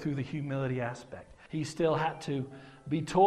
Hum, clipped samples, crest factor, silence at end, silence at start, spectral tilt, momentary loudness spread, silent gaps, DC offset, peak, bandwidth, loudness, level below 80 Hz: none; under 0.1%; 20 dB; 0 s; 0 s; -6.5 dB/octave; 16 LU; none; under 0.1%; -12 dBFS; 12 kHz; -34 LUFS; -60 dBFS